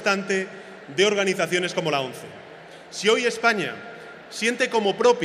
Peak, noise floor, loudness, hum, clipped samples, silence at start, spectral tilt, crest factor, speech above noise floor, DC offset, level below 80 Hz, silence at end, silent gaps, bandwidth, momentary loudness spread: -4 dBFS; -43 dBFS; -23 LUFS; none; under 0.1%; 0 s; -3.5 dB/octave; 20 dB; 21 dB; under 0.1%; -72 dBFS; 0 s; none; 15 kHz; 20 LU